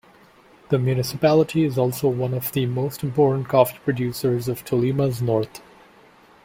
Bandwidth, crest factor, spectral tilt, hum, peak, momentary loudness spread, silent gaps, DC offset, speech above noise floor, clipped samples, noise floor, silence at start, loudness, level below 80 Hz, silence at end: 16.5 kHz; 20 dB; -7 dB/octave; none; -2 dBFS; 6 LU; none; under 0.1%; 31 dB; under 0.1%; -52 dBFS; 0.7 s; -22 LUFS; -54 dBFS; 0.85 s